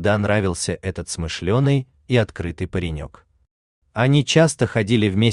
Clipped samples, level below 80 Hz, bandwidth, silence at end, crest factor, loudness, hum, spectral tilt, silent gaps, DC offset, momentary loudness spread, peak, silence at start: under 0.1%; -44 dBFS; 11 kHz; 0 s; 18 dB; -20 LUFS; none; -5.5 dB/octave; 3.51-3.82 s; under 0.1%; 12 LU; -2 dBFS; 0 s